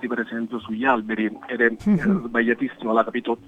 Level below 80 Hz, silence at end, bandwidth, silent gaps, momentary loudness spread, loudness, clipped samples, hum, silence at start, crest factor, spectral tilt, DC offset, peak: -54 dBFS; 0.1 s; 8.2 kHz; none; 6 LU; -23 LUFS; under 0.1%; none; 0 s; 18 dB; -8 dB/octave; under 0.1%; -4 dBFS